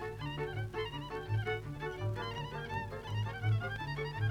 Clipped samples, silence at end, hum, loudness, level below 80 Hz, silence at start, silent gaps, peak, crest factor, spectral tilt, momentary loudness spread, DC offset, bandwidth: under 0.1%; 0 s; 50 Hz at -50 dBFS; -38 LUFS; -54 dBFS; 0 s; none; -24 dBFS; 14 dB; -6.5 dB/octave; 6 LU; under 0.1%; 11.5 kHz